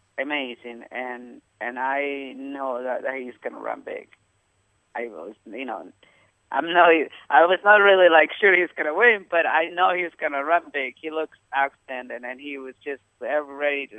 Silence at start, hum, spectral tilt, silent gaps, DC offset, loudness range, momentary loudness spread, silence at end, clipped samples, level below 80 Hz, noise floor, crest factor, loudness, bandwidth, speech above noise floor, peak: 0.2 s; none; -5 dB/octave; none; under 0.1%; 15 LU; 19 LU; 0 s; under 0.1%; -78 dBFS; -67 dBFS; 22 dB; -21 LUFS; 8.4 kHz; 45 dB; -2 dBFS